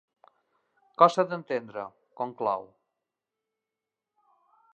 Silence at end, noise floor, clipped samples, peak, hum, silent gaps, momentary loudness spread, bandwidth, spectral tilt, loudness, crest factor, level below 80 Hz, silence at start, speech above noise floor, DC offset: 2.1 s; -88 dBFS; under 0.1%; -4 dBFS; none; none; 19 LU; 8.8 kHz; -5.5 dB/octave; -27 LUFS; 28 dB; -84 dBFS; 1 s; 62 dB; under 0.1%